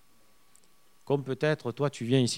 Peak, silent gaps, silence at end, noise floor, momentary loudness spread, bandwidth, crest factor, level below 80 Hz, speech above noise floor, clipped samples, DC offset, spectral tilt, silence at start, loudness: -10 dBFS; none; 0 s; -65 dBFS; 5 LU; 15 kHz; 20 dB; -76 dBFS; 37 dB; under 0.1%; 0.1%; -5.5 dB/octave; 1.05 s; -30 LUFS